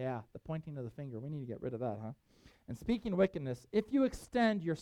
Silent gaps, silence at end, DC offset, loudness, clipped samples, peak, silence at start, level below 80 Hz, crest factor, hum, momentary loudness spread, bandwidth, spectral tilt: none; 0 s; under 0.1%; -37 LUFS; under 0.1%; -18 dBFS; 0 s; -60 dBFS; 20 dB; none; 13 LU; 13.5 kHz; -7 dB/octave